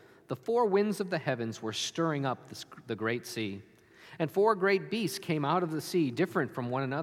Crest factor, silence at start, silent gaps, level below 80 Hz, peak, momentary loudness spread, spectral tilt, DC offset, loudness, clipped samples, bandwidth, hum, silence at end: 18 dB; 0.3 s; none; -78 dBFS; -12 dBFS; 12 LU; -5.5 dB/octave; under 0.1%; -31 LUFS; under 0.1%; 16 kHz; none; 0 s